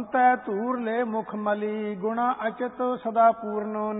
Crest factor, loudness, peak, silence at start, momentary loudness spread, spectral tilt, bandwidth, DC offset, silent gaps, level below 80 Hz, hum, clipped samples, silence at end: 18 dB; -26 LUFS; -8 dBFS; 0 s; 8 LU; -10.5 dB/octave; 4 kHz; under 0.1%; none; -70 dBFS; none; under 0.1%; 0 s